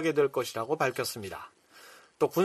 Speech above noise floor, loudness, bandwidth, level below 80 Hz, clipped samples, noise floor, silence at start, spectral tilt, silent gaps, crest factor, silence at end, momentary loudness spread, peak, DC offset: 24 dB; -31 LUFS; 14.5 kHz; -70 dBFS; under 0.1%; -54 dBFS; 0 s; -4.5 dB/octave; none; 18 dB; 0 s; 23 LU; -12 dBFS; under 0.1%